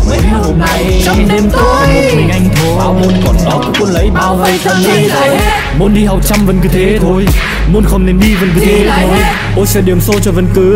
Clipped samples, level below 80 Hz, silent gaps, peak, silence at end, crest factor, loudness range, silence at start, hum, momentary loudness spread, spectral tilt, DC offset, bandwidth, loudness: under 0.1%; -14 dBFS; none; 0 dBFS; 0 s; 8 dB; 0 LU; 0 s; none; 2 LU; -5.5 dB/octave; under 0.1%; 16.5 kHz; -9 LUFS